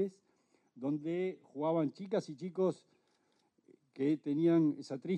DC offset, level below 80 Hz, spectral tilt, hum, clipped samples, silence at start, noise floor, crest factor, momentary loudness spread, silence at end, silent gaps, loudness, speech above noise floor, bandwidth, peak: under 0.1%; -86 dBFS; -8.5 dB/octave; none; under 0.1%; 0 s; -76 dBFS; 16 dB; 11 LU; 0 s; none; -35 LUFS; 42 dB; 8.8 kHz; -20 dBFS